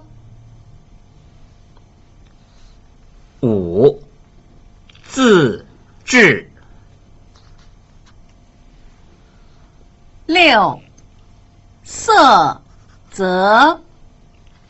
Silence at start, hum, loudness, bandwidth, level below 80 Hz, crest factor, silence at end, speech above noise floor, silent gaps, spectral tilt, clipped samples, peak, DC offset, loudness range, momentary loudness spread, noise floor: 3.4 s; none; -13 LUFS; 8.2 kHz; -46 dBFS; 18 dB; 0.95 s; 34 dB; none; -4.5 dB/octave; under 0.1%; 0 dBFS; under 0.1%; 7 LU; 23 LU; -46 dBFS